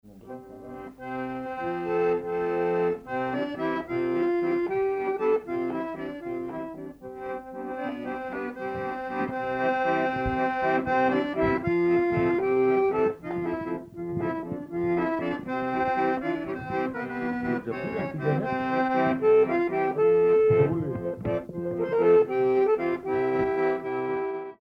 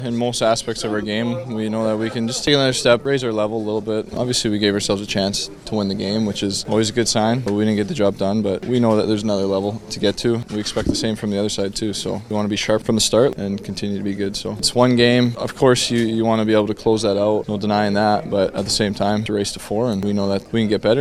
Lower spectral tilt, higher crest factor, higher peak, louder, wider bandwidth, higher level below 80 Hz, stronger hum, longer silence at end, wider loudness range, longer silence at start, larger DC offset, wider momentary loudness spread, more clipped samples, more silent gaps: first, -8.5 dB/octave vs -4.5 dB/octave; about the same, 16 dB vs 18 dB; second, -10 dBFS vs 0 dBFS; second, -27 LUFS vs -19 LUFS; second, 6 kHz vs 13.5 kHz; second, -54 dBFS vs -44 dBFS; neither; about the same, 0.1 s vs 0 s; first, 7 LU vs 3 LU; about the same, 0.05 s vs 0 s; neither; first, 12 LU vs 7 LU; neither; neither